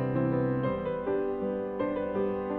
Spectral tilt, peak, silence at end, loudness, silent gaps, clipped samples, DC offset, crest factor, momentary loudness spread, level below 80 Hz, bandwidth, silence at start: -11 dB/octave; -18 dBFS; 0 s; -30 LUFS; none; under 0.1%; under 0.1%; 12 dB; 4 LU; -54 dBFS; 4.4 kHz; 0 s